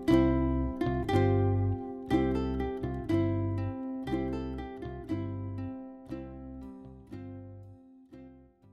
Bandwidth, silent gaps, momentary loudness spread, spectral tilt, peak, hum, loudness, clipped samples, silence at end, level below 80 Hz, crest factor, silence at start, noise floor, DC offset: 11.5 kHz; none; 20 LU; -9 dB/octave; -12 dBFS; none; -32 LUFS; under 0.1%; 0.3 s; -42 dBFS; 18 dB; 0 s; -54 dBFS; under 0.1%